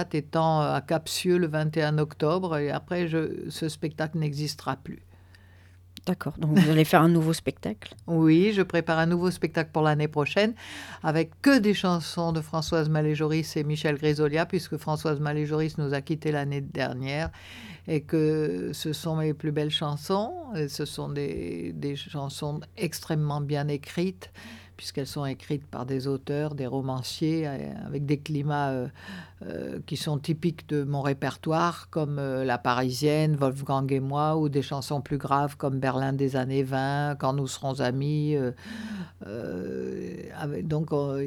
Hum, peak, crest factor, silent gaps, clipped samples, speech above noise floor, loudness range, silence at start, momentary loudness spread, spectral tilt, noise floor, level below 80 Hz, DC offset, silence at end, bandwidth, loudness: none; -6 dBFS; 22 dB; none; under 0.1%; 26 dB; 7 LU; 0 s; 10 LU; -6.5 dB/octave; -53 dBFS; -58 dBFS; under 0.1%; 0 s; 16.5 kHz; -27 LUFS